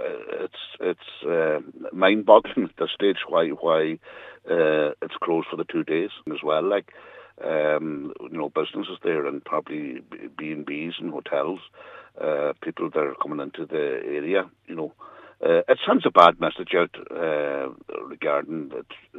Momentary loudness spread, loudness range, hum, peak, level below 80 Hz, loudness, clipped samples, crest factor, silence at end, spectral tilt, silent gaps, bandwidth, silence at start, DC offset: 15 LU; 8 LU; none; 0 dBFS; -70 dBFS; -24 LUFS; under 0.1%; 24 dB; 0 s; -7 dB/octave; none; 7 kHz; 0 s; under 0.1%